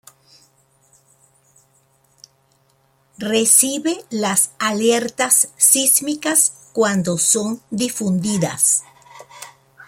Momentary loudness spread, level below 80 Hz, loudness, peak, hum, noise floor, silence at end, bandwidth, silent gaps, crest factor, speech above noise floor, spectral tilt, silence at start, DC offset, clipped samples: 11 LU; -64 dBFS; -16 LUFS; 0 dBFS; none; -60 dBFS; 0.05 s; 16.5 kHz; none; 20 dB; 42 dB; -2.5 dB/octave; 3.2 s; under 0.1%; under 0.1%